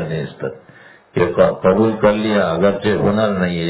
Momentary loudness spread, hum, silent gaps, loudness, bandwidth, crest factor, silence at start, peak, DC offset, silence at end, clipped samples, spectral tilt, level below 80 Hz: 12 LU; none; none; -16 LUFS; 4 kHz; 16 dB; 0 s; 0 dBFS; under 0.1%; 0 s; under 0.1%; -11 dB/octave; -44 dBFS